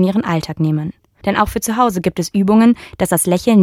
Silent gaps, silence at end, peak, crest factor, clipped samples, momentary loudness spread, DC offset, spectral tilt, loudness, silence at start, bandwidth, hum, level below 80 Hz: none; 0 s; 0 dBFS; 14 dB; under 0.1%; 8 LU; under 0.1%; -5.5 dB/octave; -16 LUFS; 0 s; 16 kHz; none; -40 dBFS